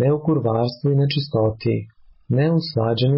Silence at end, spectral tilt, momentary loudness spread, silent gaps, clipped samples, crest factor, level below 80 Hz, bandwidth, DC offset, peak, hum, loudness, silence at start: 0 s; -12 dB/octave; 5 LU; none; under 0.1%; 10 dB; -50 dBFS; 5.8 kHz; under 0.1%; -8 dBFS; none; -21 LUFS; 0 s